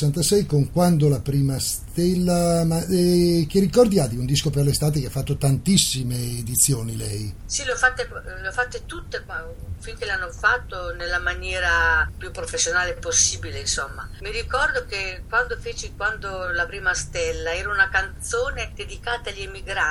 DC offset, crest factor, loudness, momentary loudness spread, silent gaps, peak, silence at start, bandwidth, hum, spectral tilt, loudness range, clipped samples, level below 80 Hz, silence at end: under 0.1%; 20 dB; -22 LUFS; 13 LU; none; -2 dBFS; 0 s; 18 kHz; none; -4 dB/octave; 6 LU; under 0.1%; -36 dBFS; 0 s